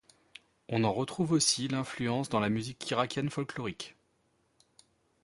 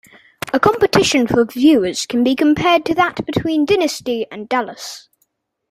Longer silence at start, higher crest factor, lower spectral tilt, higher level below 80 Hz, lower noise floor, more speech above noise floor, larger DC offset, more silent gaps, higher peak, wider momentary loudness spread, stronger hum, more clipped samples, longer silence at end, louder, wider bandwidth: first, 0.7 s vs 0.45 s; about the same, 20 dB vs 16 dB; about the same, -4 dB/octave vs -4.5 dB/octave; second, -66 dBFS vs -48 dBFS; first, -73 dBFS vs -66 dBFS; second, 42 dB vs 51 dB; neither; neither; second, -14 dBFS vs 0 dBFS; about the same, 12 LU vs 11 LU; neither; neither; first, 1.35 s vs 0.7 s; second, -31 LUFS vs -16 LUFS; second, 11.5 kHz vs 15.5 kHz